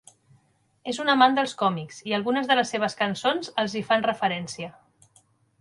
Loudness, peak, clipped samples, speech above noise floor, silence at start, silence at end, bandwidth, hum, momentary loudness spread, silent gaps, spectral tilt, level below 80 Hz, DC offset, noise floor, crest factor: -24 LUFS; -4 dBFS; under 0.1%; 41 dB; 0.85 s; 0.9 s; 11.5 kHz; none; 14 LU; none; -4 dB/octave; -70 dBFS; under 0.1%; -65 dBFS; 22 dB